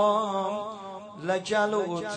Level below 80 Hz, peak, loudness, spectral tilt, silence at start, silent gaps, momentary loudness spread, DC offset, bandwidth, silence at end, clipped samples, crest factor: -72 dBFS; -12 dBFS; -28 LUFS; -4.5 dB/octave; 0 s; none; 13 LU; under 0.1%; 9.4 kHz; 0 s; under 0.1%; 16 dB